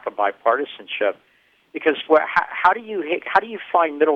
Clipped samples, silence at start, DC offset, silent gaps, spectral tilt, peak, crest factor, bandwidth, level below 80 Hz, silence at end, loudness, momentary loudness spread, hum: under 0.1%; 0.05 s; under 0.1%; none; -5 dB/octave; -2 dBFS; 18 dB; 6.2 kHz; -64 dBFS; 0 s; -20 LUFS; 8 LU; none